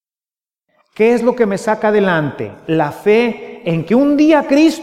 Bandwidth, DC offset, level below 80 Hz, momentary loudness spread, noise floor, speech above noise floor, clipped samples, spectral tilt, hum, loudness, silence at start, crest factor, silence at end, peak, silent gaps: 14 kHz; under 0.1%; -54 dBFS; 9 LU; under -90 dBFS; over 77 dB; under 0.1%; -6.5 dB/octave; none; -14 LUFS; 1 s; 14 dB; 0 s; 0 dBFS; none